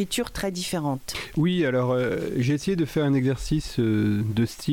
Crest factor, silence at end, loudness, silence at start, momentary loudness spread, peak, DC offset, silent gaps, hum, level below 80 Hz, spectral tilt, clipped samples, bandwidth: 10 dB; 0 s; -25 LUFS; 0 s; 6 LU; -14 dBFS; under 0.1%; none; none; -44 dBFS; -6 dB/octave; under 0.1%; 17.5 kHz